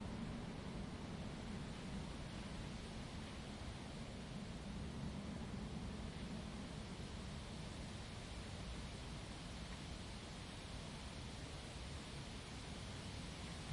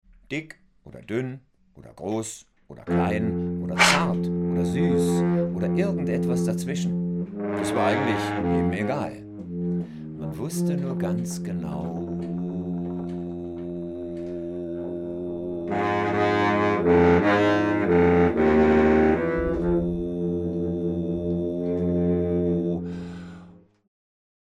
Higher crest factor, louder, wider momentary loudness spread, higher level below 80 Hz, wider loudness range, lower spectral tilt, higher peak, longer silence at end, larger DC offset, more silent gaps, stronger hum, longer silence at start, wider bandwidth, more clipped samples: second, 14 dB vs 22 dB; second, -50 LUFS vs -24 LUFS; second, 2 LU vs 14 LU; second, -56 dBFS vs -48 dBFS; second, 1 LU vs 10 LU; about the same, -5 dB/octave vs -6 dB/octave; second, -36 dBFS vs -2 dBFS; second, 0 s vs 1.05 s; neither; neither; neither; second, 0 s vs 0.3 s; second, 11.5 kHz vs 13.5 kHz; neither